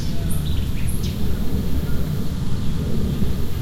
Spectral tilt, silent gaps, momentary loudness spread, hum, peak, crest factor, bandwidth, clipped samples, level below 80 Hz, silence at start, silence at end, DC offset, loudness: -6.5 dB/octave; none; 2 LU; none; -8 dBFS; 10 dB; 16 kHz; under 0.1%; -26 dBFS; 0 s; 0 s; under 0.1%; -25 LUFS